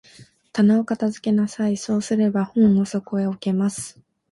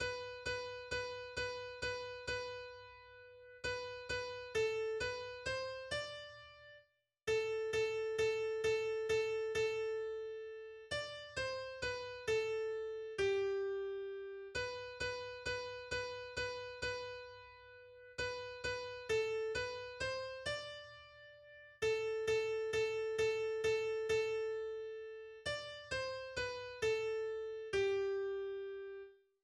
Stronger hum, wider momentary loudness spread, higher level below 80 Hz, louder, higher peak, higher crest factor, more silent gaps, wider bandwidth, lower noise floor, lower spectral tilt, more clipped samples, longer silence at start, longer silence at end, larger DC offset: neither; second, 8 LU vs 14 LU; about the same, -60 dBFS vs -64 dBFS; first, -21 LUFS vs -40 LUFS; first, -6 dBFS vs -26 dBFS; about the same, 14 dB vs 16 dB; neither; about the same, 11.5 kHz vs 12 kHz; second, -50 dBFS vs -71 dBFS; first, -6.5 dB/octave vs -3 dB/octave; neither; first, 0.2 s vs 0 s; about the same, 0.4 s vs 0.3 s; neither